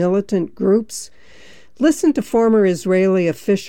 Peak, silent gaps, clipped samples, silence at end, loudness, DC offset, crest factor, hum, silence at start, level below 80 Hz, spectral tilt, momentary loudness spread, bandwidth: -4 dBFS; none; under 0.1%; 0 s; -17 LUFS; 0.6%; 12 dB; none; 0 s; -52 dBFS; -6 dB/octave; 9 LU; 17 kHz